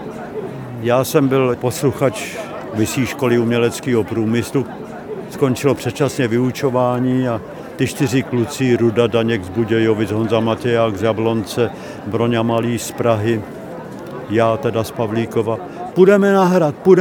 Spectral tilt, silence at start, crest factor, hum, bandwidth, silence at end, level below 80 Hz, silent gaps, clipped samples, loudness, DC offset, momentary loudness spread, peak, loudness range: -6 dB/octave; 0 s; 16 dB; none; 19 kHz; 0 s; -52 dBFS; none; under 0.1%; -17 LUFS; under 0.1%; 13 LU; 0 dBFS; 3 LU